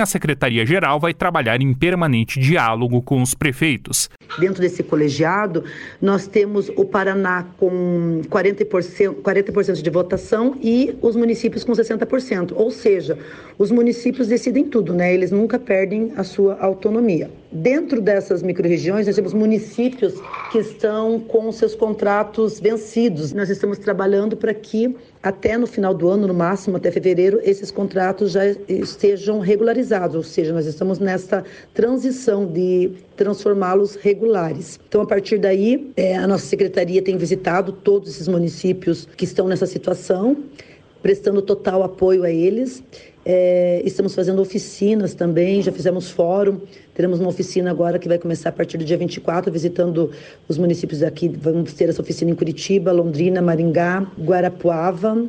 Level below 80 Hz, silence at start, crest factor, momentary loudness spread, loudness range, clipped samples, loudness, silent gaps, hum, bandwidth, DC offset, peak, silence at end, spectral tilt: -52 dBFS; 0 s; 16 dB; 5 LU; 2 LU; under 0.1%; -19 LUFS; none; none; 15.5 kHz; under 0.1%; -2 dBFS; 0 s; -6 dB/octave